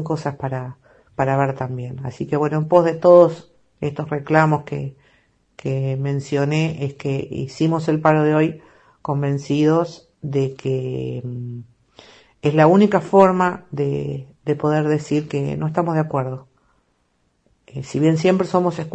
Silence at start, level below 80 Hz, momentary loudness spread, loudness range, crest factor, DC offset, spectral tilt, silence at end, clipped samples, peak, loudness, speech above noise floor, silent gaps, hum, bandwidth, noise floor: 0 s; -56 dBFS; 16 LU; 5 LU; 20 dB; under 0.1%; -8 dB/octave; 0.05 s; under 0.1%; 0 dBFS; -19 LUFS; 47 dB; none; none; 8.4 kHz; -66 dBFS